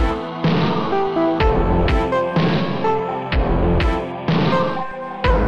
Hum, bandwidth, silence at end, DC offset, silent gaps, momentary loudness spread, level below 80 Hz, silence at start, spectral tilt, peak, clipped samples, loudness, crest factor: none; 7.6 kHz; 0 s; under 0.1%; none; 5 LU; -24 dBFS; 0 s; -8 dB/octave; -4 dBFS; under 0.1%; -19 LUFS; 14 dB